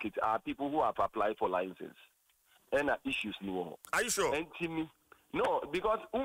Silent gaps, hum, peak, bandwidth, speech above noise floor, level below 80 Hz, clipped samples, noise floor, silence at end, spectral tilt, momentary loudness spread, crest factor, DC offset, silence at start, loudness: none; none; -20 dBFS; 16 kHz; 35 dB; -62 dBFS; under 0.1%; -69 dBFS; 0 s; -3.5 dB/octave; 9 LU; 16 dB; under 0.1%; 0 s; -34 LUFS